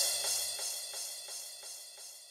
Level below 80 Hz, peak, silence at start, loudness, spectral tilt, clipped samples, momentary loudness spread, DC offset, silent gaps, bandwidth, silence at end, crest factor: -78 dBFS; -18 dBFS; 0 s; -36 LUFS; 3 dB/octave; under 0.1%; 14 LU; under 0.1%; none; 16 kHz; 0 s; 20 dB